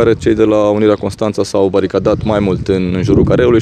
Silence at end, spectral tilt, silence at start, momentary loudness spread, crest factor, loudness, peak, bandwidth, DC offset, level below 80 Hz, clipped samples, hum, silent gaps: 0 s; -7.5 dB/octave; 0 s; 5 LU; 12 dB; -13 LUFS; 0 dBFS; 11 kHz; under 0.1%; -32 dBFS; under 0.1%; none; none